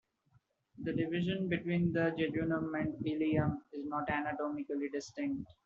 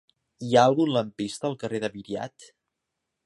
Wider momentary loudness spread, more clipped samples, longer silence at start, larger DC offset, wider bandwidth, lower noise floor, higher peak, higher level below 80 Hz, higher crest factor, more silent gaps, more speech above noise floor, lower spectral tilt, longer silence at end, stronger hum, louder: second, 7 LU vs 15 LU; neither; first, 0.75 s vs 0.4 s; neither; second, 7.4 kHz vs 11.5 kHz; second, -72 dBFS vs -83 dBFS; second, -18 dBFS vs -6 dBFS; about the same, -64 dBFS vs -66 dBFS; about the same, 18 dB vs 22 dB; neither; second, 37 dB vs 58 dB; about the same, -6 dB/octave vs -5.5 dB/octave; second, 0.15 s vs 0.8 s; neither; second, -36 LUFS vs -25 LUFS